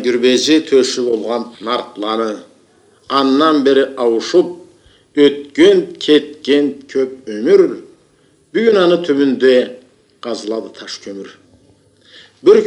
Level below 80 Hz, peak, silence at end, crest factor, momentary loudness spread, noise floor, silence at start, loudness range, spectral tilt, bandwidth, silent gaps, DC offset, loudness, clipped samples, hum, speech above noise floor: -64 dBFS; 0 dBFS; 0 s; 14 dB; 14 LU; -53 dBFS; 0 s; 3 LU; -4 dB/octave; 10.5 kHz; none; under 0.1%; -14 LUFS; under 0.1%; none; 40 dB